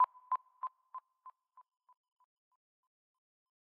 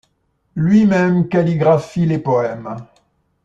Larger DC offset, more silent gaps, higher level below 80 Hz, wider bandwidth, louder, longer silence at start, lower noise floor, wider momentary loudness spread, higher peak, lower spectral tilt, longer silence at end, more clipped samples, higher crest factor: neither; neither; second, under -90 dBFS vs -52 dBFS; second, 3.5 kHz vs 7.8 kHz; second, -40 LUFS vs -15 LUFS; second, 0 s vs 0.55 s; about the same, -61 dBFS vs -64 dBFS; first, 23 LU vs 17 LU; second, -20 dBFS vs -2 dBFS; second, 8.5 dB/octave vs -8.5 dB/octave; first, 2.3 s vs 0.6 s; neither; first, 22 dB vs 14 dB